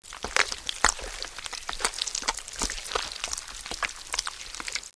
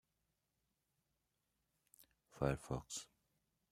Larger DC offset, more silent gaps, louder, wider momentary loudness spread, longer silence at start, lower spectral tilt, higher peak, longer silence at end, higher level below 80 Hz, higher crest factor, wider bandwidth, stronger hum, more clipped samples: neither; neither; first, -29 LUFS vs -44 LUFS; about the same, 10 LU vs 10 LU; second, 0 s vs 2 s; second, 0 dB/octave vs -5 dB/octave; first, 0 dBFS vs -22 dBFS; second, 0.05 s vs 0.65 s; first, -46 dBFS vs -64 dBFS; about the same, 30 dB vs 28 dB; second, 11 kHz vs 15.5 kHz; neither; neither